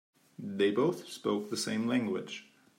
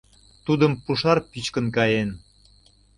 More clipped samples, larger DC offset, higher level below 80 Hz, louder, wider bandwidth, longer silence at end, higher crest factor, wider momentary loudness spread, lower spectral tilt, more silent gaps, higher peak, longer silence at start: neither; neither; second, -84 dBFS vs -52 dBFS; second, -32 LUFS vs -23 LUFS; first, 16 kHz vs 11.5 kHz; second, 0.35 s vs 0.8 s; about the same, 16 dB vs 20 dB; first, 15 LU vs 10 LU; about the same, -5 dB/octave vs -6 dB/octave; neither; second, -16 dBFS vs -4 dBFS; about the same, 0.4 s vs 0.45 s